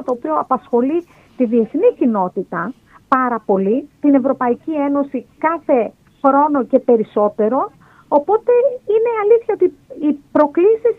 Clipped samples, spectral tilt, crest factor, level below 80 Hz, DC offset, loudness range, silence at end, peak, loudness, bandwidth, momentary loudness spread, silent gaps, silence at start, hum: under 0.1%; -9.5 dB/octave; 16 dB; -60 dBFS; under 0.1%; 2 LU; 0.05 s; 0 dBFS; -17 LUFS; 4.1 kHz; 7 LU; none; 0 s; none